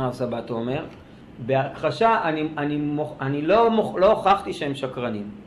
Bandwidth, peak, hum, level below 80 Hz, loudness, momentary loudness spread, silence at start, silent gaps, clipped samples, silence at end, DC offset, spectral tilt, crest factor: 12 kHz; -6 dBFS; none; -52 dBFS; -23 LUFS; 11 LU; 0 s; none; under 0.1%; 0 s; under 0.1%; -7 dB/octave; 16 dB